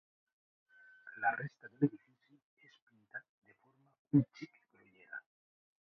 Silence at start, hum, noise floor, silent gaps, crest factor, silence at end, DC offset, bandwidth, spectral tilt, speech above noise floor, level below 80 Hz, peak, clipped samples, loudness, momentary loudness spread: 1.05 s; none; -71 dBFS; 2.43-2.57 s, 2.82-2.87 s, 3.29-3.42 s, 3.99-4.05 s; 24 dB; 0.75 s; under 0.1%; 6.2 kHz; -7.5 dB/octave; 37 dB; -84 dBFS; -16 dBFS; under 0.1%; -36 LUFS; 21 LU